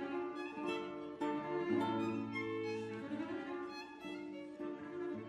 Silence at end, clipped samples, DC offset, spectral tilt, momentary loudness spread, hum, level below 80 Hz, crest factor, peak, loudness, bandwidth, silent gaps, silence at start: 0 s; under 0.1%; under 0.1%; -6.5 dB/octave; 10 LU; none; -78 dBFS; 16 dB; -24 dBFS; -42 LUFS; 10.5 kHz; none; 0 s